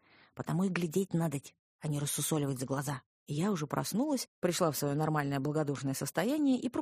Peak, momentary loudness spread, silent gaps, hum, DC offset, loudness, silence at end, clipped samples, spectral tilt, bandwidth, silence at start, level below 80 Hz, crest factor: -14 dBFS; 7 LU; 1.59-1.79 s, 3.06-3.26 s, 4.28-4.42 s; none; under 0.1%; -33 LUFS; 0 s; under 0.1%; -5.5 dB/octave; 15.5 kHz; 0.35 s; -70 dBFS; 18 dB